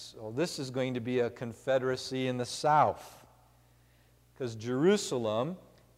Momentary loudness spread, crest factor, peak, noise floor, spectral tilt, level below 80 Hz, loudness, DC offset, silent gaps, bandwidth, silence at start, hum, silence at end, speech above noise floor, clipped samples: 13 LU; 20 dB; -14 dBFS; -64 dBFS; -5 dB/octave; -68 dBFS; -31 LUFS; under 0.1%; none; 16 kHz; 0 s; 60 Hz at -60 dBFS; 0.35 s; 33 dB; under 0.1%